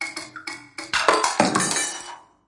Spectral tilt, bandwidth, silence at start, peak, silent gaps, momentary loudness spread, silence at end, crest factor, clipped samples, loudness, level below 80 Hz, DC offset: -2 dB/octave; 11.5 kHz; 0 s; -2 dBFS; none; 15 LU; 0.25 s; 22 dB; under 0.1%; -21 LUFS; -60 dBFS; under 0.1%